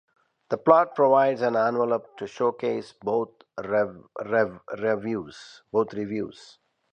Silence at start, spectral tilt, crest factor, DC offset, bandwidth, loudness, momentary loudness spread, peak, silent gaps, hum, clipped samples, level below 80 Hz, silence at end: 0.5 s; -7 dB/octave; 22 dB; under 0.1%; 9 kHz; -25 LUFS; 16 LU; -4 dBFS; none; none; under 0.1%; -68 dBFS; 0.5 s